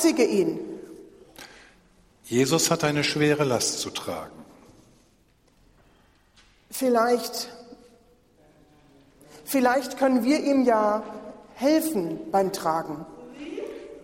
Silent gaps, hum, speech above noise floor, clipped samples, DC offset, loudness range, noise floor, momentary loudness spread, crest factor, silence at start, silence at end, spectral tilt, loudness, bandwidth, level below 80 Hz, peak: none; none; 39 dB; under 0.1%; under 0.1%; 6 LU; -62 dBFS; 21 LU; 18 dB; 0 s; 0 s; -4 dB/octave; -24 LUFS; 16 kHz; -62 dBFS; -8 dBFS